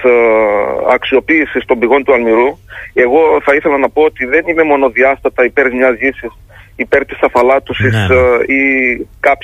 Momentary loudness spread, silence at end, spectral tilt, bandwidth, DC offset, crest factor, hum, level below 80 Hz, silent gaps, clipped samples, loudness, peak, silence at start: 5 LU; 0.1 s; -7 dB/octave; 11.5 kHz; under 0.1%; 10 dB; none; -38 dBFS; none; under 0.1%; -11 LUFS; 0 dBFS; 0 s